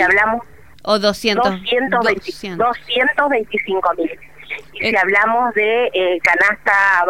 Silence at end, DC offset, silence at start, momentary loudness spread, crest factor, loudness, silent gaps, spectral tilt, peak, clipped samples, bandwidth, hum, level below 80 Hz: 0 s; 0.8%; 0 s; 12 LU; 16 dB; -16 LUFS; none; -4 dB/octave; 0 dBFS; under 0.1%; 16.5 kHz; none; -50 dBFS